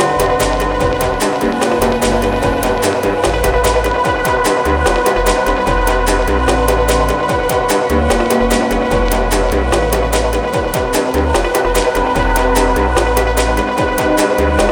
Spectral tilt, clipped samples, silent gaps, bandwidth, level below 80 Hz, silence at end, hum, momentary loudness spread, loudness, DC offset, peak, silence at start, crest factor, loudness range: -4.5 dB/octave; under 0.1%; none; over 20 kHz; -20 dBFS; 0 s; none; 2 LU; -14 LUFS; under 0.1%; 0 dBFS; 0 s; 14 dB; 1 LU